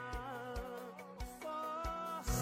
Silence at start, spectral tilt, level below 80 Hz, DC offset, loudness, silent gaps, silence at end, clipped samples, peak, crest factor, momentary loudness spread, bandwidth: 0 s; -4.5 dB/octave; -48 dBFS; under 0.1%; -44 LUFS; none; 0 s; under 0.1%; -24 dBFS; 18 dB; 8 LU; 16.5 kHz